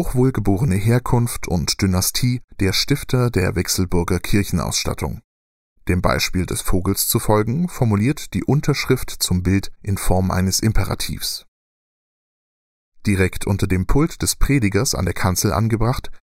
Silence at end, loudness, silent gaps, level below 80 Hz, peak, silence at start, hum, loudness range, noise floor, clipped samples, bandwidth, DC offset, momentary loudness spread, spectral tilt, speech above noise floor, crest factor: 0.05 s; -20 LUFS; 2.44-2.48 s, 5.24-5.76 s, 11.48-12.92 s; -30 dBFS; -2 dBFS; 0 s; none; 4 LU; under -90 dBFS; under 0.1%; 16.5 kHz; under 0.1%; 5 LU; -5 dB/octave; over 72 dB; 18 dB